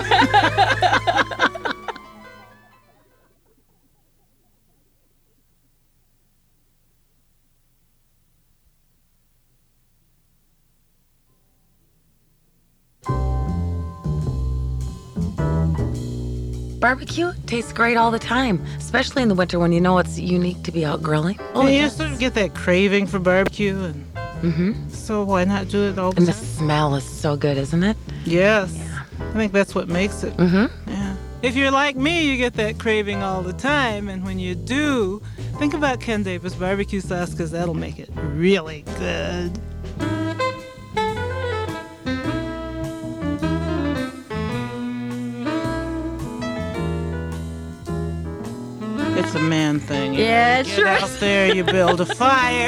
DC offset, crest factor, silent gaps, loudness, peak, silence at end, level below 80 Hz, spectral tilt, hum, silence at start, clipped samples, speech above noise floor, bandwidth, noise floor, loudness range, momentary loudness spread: under 0.1%; 18 dB; none; -21 LUFS; -4 dBFS; 0 s; -36 dBFS; -5.5 dB/octave; none; 0 s; under 0.1%; 41 dB; 14 kHz; -61 dBFS; 7 LU; 12 LU